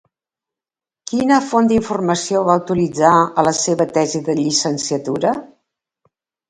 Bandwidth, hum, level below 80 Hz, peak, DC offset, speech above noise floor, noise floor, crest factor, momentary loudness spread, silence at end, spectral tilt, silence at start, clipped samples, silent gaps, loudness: 11 kHz; none; -54 dBFS; 0 dBFS; under 0.1%; 74 dB; -90 dBFS; 18 dB; 7 LU; 1.05 s; -4.5 dB/octave; 1.05 s; under 0.1%; none; -17 LUFS